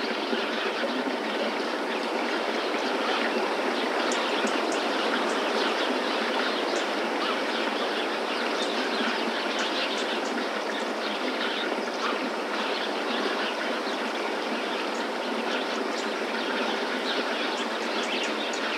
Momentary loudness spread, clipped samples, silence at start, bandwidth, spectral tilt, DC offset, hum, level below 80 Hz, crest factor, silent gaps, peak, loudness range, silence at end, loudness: 3 LU; under 0.1%; 0 s; 16.5 kHz; -2.5 dB/octave; under 0.1%; none; under -90 dBFS; 16 dB; none; -12 dBFS; 2 LU; 0 s; -27 LUFS